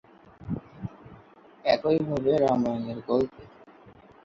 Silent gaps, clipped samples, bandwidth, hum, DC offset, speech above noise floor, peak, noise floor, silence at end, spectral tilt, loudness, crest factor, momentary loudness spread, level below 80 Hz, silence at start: none; under 0.1%; 7.6 kHz; none; under 0.1%; 28 dB; -10 dBFS; -53 dBFS; 0.35 s; -7.5 dB/octave; -27 LUFS; 20 dB; 18 LU; -56 dBFS; 0.4 s